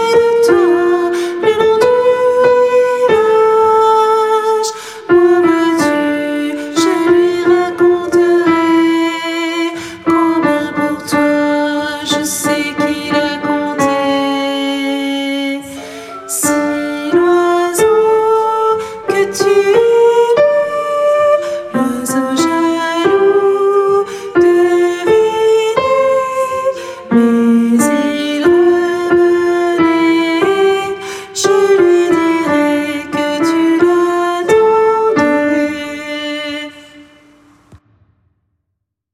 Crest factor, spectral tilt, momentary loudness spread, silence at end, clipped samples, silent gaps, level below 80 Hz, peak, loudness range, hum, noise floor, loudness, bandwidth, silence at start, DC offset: 12 dB; -4 dB/octave; 8 LU; 1.35 s; under 0.1%; none; -56 dBFS; 0 dBFS; 4 LU; none; -73 dBFS; -12 LUFS; 15.5 kHz; 0 s; under 0.1%